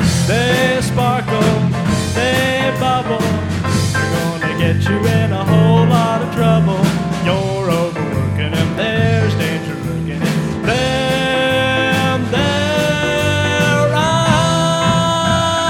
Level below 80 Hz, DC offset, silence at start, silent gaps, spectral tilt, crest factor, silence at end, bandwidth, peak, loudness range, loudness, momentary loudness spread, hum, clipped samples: -36 dBFS; under 0.1%; 0 s; none; -5.5 dB/octave; 14 dB; 0 s; 16 kHz; 0 dBFS; 3 LU; -15 LUFS; 5 LU; none; under 0.1%